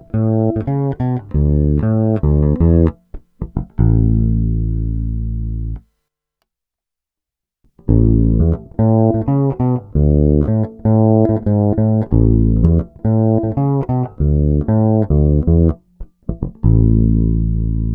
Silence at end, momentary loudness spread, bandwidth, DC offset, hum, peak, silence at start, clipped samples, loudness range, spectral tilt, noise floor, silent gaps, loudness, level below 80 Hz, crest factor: 0 s; 10 LU; 2.2 kHz; under 0.1%; none; 0 dBFS; 0.15 s; under 0.1%; 6 LU; -14 dB/octave; -84 dBFS; none; -15 LUFS; -22 dBFS; 14 dB